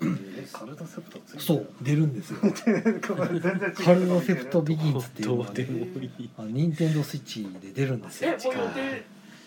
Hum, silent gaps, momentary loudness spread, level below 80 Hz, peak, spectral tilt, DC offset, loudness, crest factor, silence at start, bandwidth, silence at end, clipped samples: none; none; 15 LU; -70 dBFS; -4 dBFS; -7 dB/octave; under 0.1%; -27 LUFS; 22 dB; 0 s; 19 kHz; 0.05 s; under 0.1%